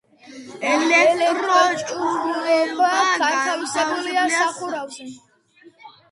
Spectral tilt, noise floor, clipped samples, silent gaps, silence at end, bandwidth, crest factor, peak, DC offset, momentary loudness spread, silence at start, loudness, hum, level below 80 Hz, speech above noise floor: -1.5 dB/octave; -52 dBFS; under 0.1%; none; 0.25 s; 11.5 kHz; 18 dB; -2 dBFS; under 0.1%; 13 LU; 0.3 s; -19 LUFS; none; -72 dBFS; 32 dB